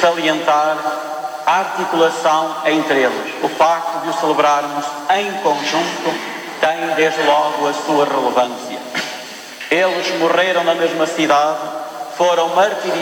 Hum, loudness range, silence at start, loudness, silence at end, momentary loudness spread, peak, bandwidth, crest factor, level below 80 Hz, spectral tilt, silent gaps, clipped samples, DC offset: none; 1 LU; 0 s; -17 LUFS; 0 s; 9 LU; -4 dBFS; 19 kHz; 14 dB; -68 dBFS; -3 dB/octave; none; under 0.1%; under 0.1%